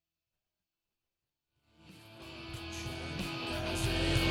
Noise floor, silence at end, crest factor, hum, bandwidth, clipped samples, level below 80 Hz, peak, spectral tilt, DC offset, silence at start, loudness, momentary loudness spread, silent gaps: under -90 dBFS; 0 s; 20 dB; none; 17.5 kHz; under 0.1%; -48 dBFS; -18 dBFS; -4.5 dB/octave; under 0.1%; 1.85 s; -36 LUFS; 20 LU; none